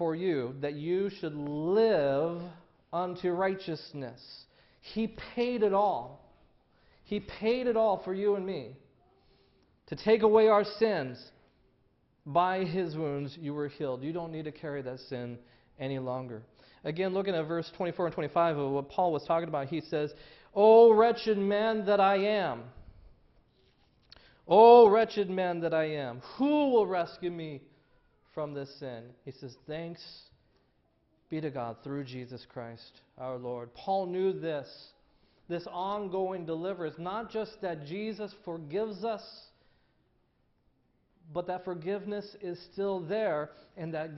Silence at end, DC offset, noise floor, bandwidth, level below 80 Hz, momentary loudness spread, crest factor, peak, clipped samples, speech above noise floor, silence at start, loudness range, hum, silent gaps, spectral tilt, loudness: 0 s; under 0.1%; -72 dBFS; 6 kHz; -66 dBFS; 18 LU; 22 dB; -8 dBFS; under 0.1%; 43 dB; 0 s; 16 LU; none; none; -5 dB/octave; -29 LUFS